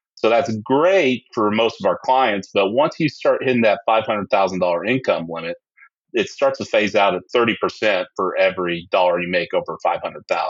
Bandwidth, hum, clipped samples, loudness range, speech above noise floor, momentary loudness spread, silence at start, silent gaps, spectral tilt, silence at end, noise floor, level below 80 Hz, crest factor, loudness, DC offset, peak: 7.6 kHz; none; under 0.1%; 2 LU; 34 dB; 7 LU; 0.25 s; 5.99-6.05 s; -5.5 dB/octave; 0 s; -53 dBFS; -70 dBFS; 16 dB; -19 LUFS; under 0.1%; -4 dBFS